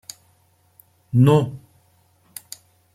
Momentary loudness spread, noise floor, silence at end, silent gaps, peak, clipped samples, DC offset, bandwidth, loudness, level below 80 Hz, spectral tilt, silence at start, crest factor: 25 LU; -60 dBFS; 1.35 s; none; -4 dBFS; under 0.1%; under 0.1%; 15.5 kHz; -18 LUFS; -60 dBFS; -7.5 dB/octave; 1.15 s; 20 dB